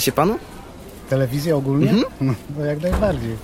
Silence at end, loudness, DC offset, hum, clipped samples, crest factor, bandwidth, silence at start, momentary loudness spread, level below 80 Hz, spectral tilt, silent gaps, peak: 0 s; -20 LUFS; under 0.1%; none; under 0.1%; 18 dB; 16.5 kHz; 0 s; 20 LU; -34 dBFS; -6 dB/octave; none; -4 dBFS